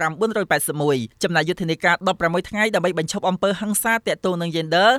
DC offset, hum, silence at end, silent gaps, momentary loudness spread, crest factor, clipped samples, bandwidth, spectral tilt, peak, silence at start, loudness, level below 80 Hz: under 0.1%; none; 0 s; none; 4 LU; 16 dB; under 0.1%; 16.5 kHz; -4 dB/octave; -4 dBFS; 0 s; -21 LUFS; -54 dBFS